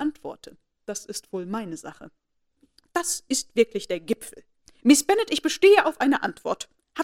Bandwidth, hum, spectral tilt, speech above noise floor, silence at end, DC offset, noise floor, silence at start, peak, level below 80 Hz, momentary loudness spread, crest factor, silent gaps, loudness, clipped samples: 16 kHz; none; -2.5 dB/octave; 43 dB; 0 s; under 0.1%; -66 dBFS; 0 s; -2 dBFS; -64 dBFS; 21 LU; 22 dB; none; -23 LUFS; under 0.1%